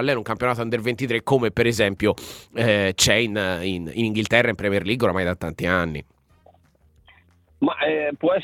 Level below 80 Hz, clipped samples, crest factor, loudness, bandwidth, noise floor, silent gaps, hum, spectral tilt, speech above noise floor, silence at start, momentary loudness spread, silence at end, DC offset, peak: -48 dBFS; under 0.1%; 22 dB; -22 LUFS; 17 kHz; -58 dBFS; none; none; -4.5 dB/octave; 36 dB; 0 s; 8 LU; 0 s; under 0.1%; 0 dBFS